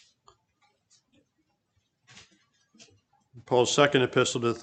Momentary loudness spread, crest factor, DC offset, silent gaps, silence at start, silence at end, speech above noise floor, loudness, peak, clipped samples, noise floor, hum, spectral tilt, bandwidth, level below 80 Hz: 5 LU; 26 dB; under 0.1%; none; 3.35 s; 0 s; 52 dB; -24 LUFS; -4 dBFS; under 0.1%; -75 dBFS; none; -4 dB/octave; 9.4 kHz; -70 dBFS